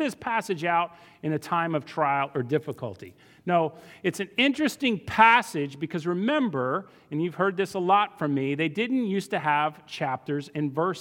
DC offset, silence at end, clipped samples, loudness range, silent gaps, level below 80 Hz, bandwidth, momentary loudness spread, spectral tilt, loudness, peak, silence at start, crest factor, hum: under 0.1%; 0 s; under 0.1%; 4 LU; none; -68 dBFS; 17.5 kHz; 9 LU; -5.5 dB/octave; -26 LUFS; -4 dBFS; 0 s; 22 dB; none